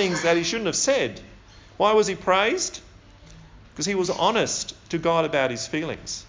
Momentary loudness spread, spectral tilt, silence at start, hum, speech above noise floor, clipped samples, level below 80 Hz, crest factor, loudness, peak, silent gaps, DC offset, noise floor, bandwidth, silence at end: 9 LU; -3 dB/octave; 0 s; none; 24 dB; under 0.1%; -52 dBFS; 18 dB; -23 LUFS; -6 dBFS; none; under 0.1%; -48 dBFS; 7.8 kHz; 0 s